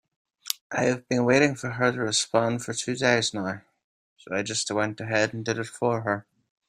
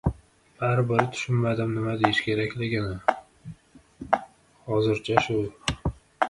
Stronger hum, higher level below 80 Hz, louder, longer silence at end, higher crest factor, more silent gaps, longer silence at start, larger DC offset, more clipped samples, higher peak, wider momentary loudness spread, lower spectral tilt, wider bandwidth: neither; second, -66 dBFS vs -44 dBFS; about the same, -26 LUFS vs -26 LUFS; first, 0.45 s vs 0 s; about the same, 26 dB vs 24 dB; first, 0.61-0.70 s, 3.84-4.16 s vs none; first, 0.45 s vs 0.05 s; neither; neither; about the same, 0 dBFS vs -2 dBFS; second, 10 LU vs 14 LU; second, -4 dB/octave vs -6 dB/octave; first, 15 kHz vs 11.5 kHz